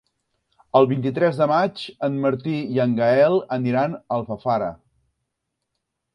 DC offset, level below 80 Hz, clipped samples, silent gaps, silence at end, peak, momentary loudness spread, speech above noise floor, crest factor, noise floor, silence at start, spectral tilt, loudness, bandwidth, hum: under 0.1%; -62 dBFS; under 0.1%; none; 1.4 s; -2 dBFS; 8 LU; 59 dB; 20 dB; -79 dBFS; 0.75 s; -8.5 dB/octave; -21 LUFS; 11 kHz; none